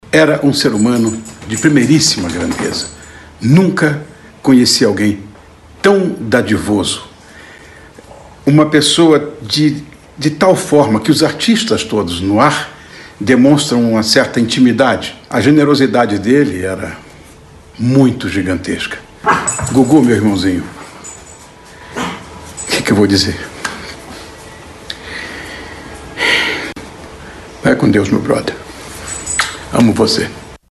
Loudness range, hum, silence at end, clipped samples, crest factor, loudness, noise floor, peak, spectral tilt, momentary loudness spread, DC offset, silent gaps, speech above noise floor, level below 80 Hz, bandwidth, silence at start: 6 LU; none; 0.15 s; 0.1%; 14 dB; -12 LUFS; -39 dBFS; 0 dBFS; -4.5 dB/octave; 19 LU; under 0.1%; none; 27 dB; -42 dBFS; 12.5 kHz; 0.05 s